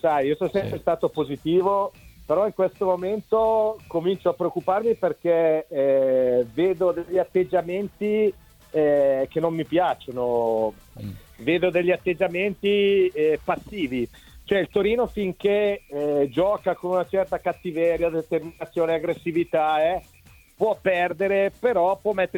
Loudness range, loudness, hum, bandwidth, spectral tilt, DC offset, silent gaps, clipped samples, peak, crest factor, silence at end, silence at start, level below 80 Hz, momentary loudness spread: 2 LU; -23 LUFS; none; 18 kHz; -7 dB/octave; under 0.1%; none; under 0.1%; -8 dBFS; 16 dB; 0 s; 0.05 s; -54 dBFS; 7 LU